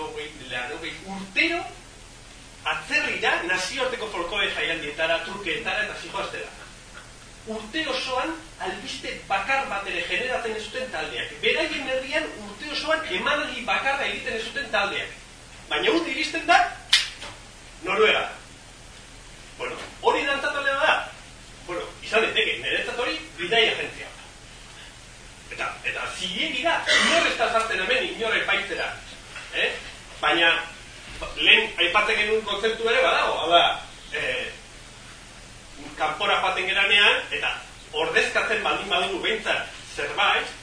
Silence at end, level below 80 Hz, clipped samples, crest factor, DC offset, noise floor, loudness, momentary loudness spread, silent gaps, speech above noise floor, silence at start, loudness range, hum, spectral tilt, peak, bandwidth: 0 s; -50 dBFS; under 0.1%; 26 dB; under 0.1%; -45 dBFS; -23 LUFS; 23 LU; none; 21 dB; 0 s; 6 LU; none; -2 dB/octave; 0 dBFS; 10.5 kHz